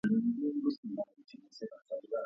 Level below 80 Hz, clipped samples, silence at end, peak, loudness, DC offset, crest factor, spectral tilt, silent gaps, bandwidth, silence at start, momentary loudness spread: -78 dBFS; under 0.1%; 0 s; -20 dBFS; -37 LUFS; under 0.1%; 14 dB; -8 dB/octave; 0.78-0.83 s; 6.6 kHz; 0.05 s; 17 LU